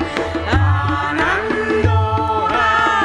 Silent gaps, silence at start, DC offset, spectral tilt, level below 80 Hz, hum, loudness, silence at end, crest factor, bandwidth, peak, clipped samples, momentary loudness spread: none; 0 s; under 0.1%; -6.5 dB/octave; -32 dBFS; none; -16 LUFS; 0 s; 16 dB; 10 kHz; 0 dBFS; under 0.1%; 4 LU